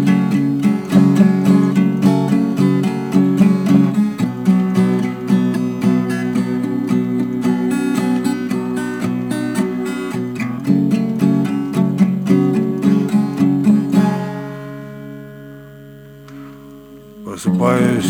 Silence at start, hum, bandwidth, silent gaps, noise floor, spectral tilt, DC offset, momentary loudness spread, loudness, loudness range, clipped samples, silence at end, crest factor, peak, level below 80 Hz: 0 s; none; 14.5 kHz; none; -38 dBFS; -7.5 dB/octave; under 0.1%; 15 LU; -16 LUFS; 6 LU; under 0.1%; 0 s; 16 dB; 0 dBFS; -54 dBFS